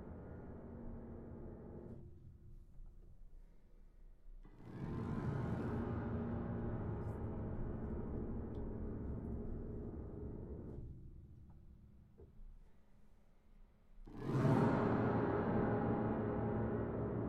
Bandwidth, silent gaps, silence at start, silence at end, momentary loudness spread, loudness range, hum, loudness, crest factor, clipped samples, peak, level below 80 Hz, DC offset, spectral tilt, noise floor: 8.6 kHz; none; 0 s; 0 s; 24 LU; 19 LU; none; -42 LUFS; 20 dB; under 0.1%; -22 dBFS; -52 dBFS; under 0.1%; -10 dB/octave; -63 dBFS